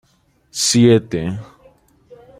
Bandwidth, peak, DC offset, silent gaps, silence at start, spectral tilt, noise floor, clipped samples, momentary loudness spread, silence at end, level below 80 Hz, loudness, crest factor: 15.5 kHz; -2 dBFS; under 0.1%; none; 0.55 s; -4.5 dB/octave; -59 dBFS; under 0.1%; 18 LU; 0.95 s; -52 dBFS; -15 LUFS; 18 dB